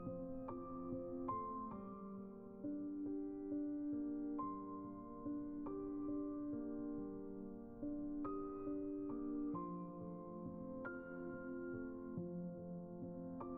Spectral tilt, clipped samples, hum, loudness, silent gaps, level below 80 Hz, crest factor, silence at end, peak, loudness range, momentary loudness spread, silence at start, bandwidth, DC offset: -7 dB/octave; under 0.1%; none; -47 LUFS; none; -66 dBFS; 14 dB; 0 s; -32 dBFS; 2 LU; 7 LU; 0 s; 2.6 kHz; under 0.1%